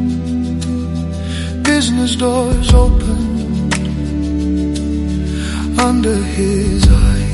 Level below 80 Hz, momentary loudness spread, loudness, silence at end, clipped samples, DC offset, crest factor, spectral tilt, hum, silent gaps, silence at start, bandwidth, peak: -18 dBFS; 8 LU; -15 LUFS; 0 s; under 0.1%; under 0.1%; 14 dB; -5.5 dB/octave; none; none; 0 s; 11.5 kHz; 0 dBFS